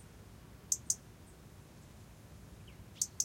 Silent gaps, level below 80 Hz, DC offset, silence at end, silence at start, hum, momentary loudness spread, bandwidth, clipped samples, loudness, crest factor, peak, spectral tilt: none; -62 dBFS; under 0.1%; 0 s; 0 s; none; 21 LU; 16.5 kHz; under 0.1%; -37 LUFS; 30 dB; -14 dBFS; -1 dB/octave